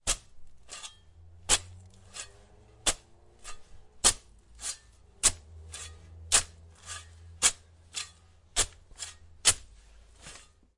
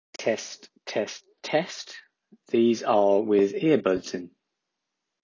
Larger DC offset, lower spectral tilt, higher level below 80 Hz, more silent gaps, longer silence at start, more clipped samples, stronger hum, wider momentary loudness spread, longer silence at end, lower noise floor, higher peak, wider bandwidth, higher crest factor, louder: neither; second, 0.5 dB/octave vs -5 dB/octave; first, -48 dBFS vs -68 dBFS; neither; second, 0.05 s vs 0.2 s; neither; neither; first, 23 LU vs 17 LU; second, 0.4 s vs 0.95 s; second, -57 dBFS vs -83 dBFS; about the same, -6 dBFS vs -8 dBFS; first, 12 kHz vs 7.6 kHz; first, 28 dB vs 18 dB; second, -28 LUFS vs -25 LUFS